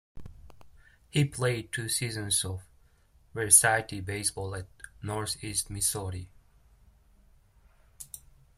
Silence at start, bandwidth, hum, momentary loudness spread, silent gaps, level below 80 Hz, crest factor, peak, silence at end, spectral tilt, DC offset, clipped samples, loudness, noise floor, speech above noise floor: 0.15 s; 16 kHz; none; 24 LU; none; -56 dBFS; 28 dB; -4 dBFS; 0.4 s; -2.5 dB/octave; under 0.1%; under 0.1%; -27 LUFS; -62 dBFS; 33 dB